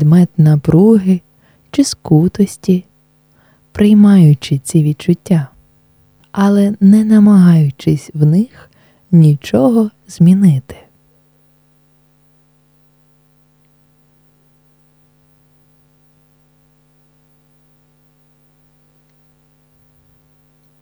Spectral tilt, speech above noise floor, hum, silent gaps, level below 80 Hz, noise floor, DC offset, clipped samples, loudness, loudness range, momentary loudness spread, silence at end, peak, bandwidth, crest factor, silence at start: -8 dB/octave; 44 dB; none; none; -48 dBFS; -54 dBFS; under 0.1%; under 0.1%; -11 LUFS; 4 LU; 10 LU; 10.1 s; 0 dBFS; over 20 kHz; 14 dB; 0 s